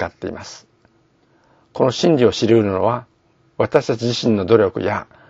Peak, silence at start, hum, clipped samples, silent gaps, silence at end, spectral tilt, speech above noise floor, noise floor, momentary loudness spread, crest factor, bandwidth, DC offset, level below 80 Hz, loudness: 0 dBFS; 0 s; none; under 0.1%; none; 0.25 s; -6 dB/octave; 41 dB; -58 dBFS; 15 LU; 18 dB; 7.8 kHz; under 0.1%; -54 dBFS; -17 LUFS